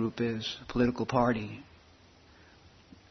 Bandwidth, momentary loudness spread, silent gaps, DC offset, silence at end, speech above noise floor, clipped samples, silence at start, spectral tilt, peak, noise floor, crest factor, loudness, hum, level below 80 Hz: 6.4 kHz; 11 LU; none; under 0.1%; 0.45 s; 28 dB; under 0.1%; 0 s; -6.5 dB/octave; -12 dBFS; -59 dBFS; 20 dB; -31 LUFS; none; -54 dBFS